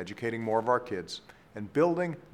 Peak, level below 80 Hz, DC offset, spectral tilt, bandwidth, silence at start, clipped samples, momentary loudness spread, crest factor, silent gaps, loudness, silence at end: -12 dBFS; -68 dBFS; under 0.1%; -6 dB/octave; 13 kHz; 0 s; under 0.1%; 15 LU; 18 dB; none; -30 LUFS; 0.1 s